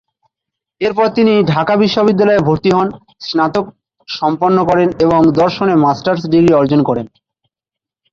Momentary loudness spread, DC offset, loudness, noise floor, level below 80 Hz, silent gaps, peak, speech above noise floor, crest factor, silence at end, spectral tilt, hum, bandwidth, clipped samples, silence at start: 10 LU; under 0.1%; -13 LUFS; -85 dBFS; -46 dBFS; none; 0 dBFS; 74 dB; 12 dB; 1.05 s; -7.5 dB/octave; none; 7.4 kHz; under 0.1%; 0.8 s